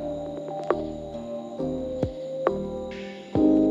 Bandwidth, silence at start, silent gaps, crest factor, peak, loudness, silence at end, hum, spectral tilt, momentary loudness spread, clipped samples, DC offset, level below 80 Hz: 7.6 kHz; 0 s; none; 20 dB; -6 dBFS; -29 LUFS; 0 s; none; -8 dB/octave; 12 LU; under 0.1%; under 0.1%; -48 dBFS